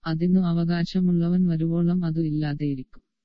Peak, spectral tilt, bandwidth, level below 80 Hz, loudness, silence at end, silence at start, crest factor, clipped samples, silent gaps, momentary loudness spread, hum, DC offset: -12 dBFS; -9.5 dB/octave; 6 kHz; -46 dBFS; -24 LUFS; 0.4 s; 0 s; 12 dB; under 0.1%; none; 6 LU; none; under 0.1%